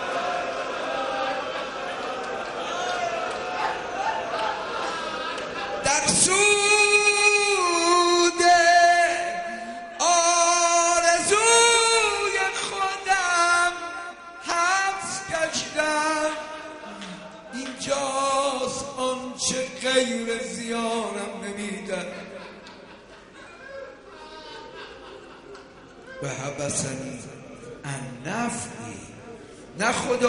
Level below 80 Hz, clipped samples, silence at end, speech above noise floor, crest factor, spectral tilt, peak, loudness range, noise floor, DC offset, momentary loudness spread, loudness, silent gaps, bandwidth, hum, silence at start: -58 dBFS; under 0.1%; 0 s; 23 dB; 20 dB; -1.5 dB/octave; -4 dBFS; 16 LU; -46 dBFS; under 0.1%; 23 LU; -22 LUFS; none; 11 kHz; none; 0 s